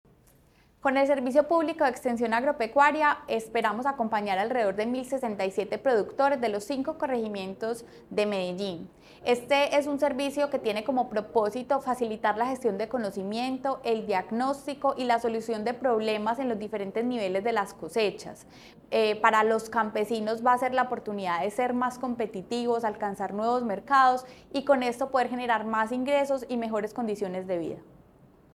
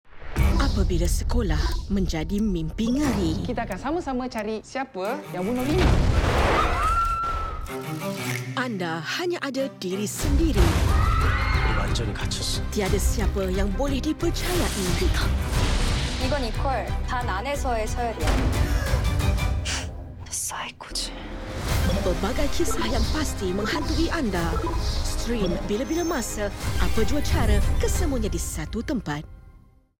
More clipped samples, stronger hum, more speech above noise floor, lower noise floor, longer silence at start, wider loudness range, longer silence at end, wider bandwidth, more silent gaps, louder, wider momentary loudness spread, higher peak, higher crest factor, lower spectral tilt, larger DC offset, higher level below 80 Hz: neither; neither; first, 33 dB vs 28 dB; first, -61 dBFS vs -52 dBFS; first, 0.85 s vs 0.1 s; about the same, 3 LU vs 3 LU; first, 0.7 s vs 0.35 s; second, 15 kHz vs 17 kHz; neither; second, -28 LUFS vs -25 LUFS; about the same, 8 LU vs 7 LU; about the same, -6 dBFS vs -6 dBFS; about the same, 20 dB vs 18 dB; about the same, -5 dB/octave vs -5 dB/octave; neither; second, -64 dBFS vs -28 dBFS